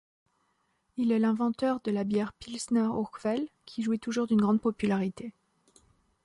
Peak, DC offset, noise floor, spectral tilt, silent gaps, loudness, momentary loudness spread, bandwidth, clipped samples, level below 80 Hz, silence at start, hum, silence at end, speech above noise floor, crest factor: -16 dBFS; under 0.1%; -74 dBFS; -6.5 dB/octave; none; -29 LUFS; 11 LU; 11.5 kHz; under 0.1%; -66 dBFS; 0.95 s; none; 0.95 s; 46 dB; 14 dB